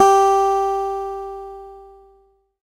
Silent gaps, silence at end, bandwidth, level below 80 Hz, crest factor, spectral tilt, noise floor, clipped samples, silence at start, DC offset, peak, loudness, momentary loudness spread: none; 0.8 s; 15.5 kHz; -50 dBFS; 18 dB; -3 dB/octave; -57 dBFS; under 0.1%; 0 s; under 0.1%; 0 dBFS; -18 LUFS; 23 LU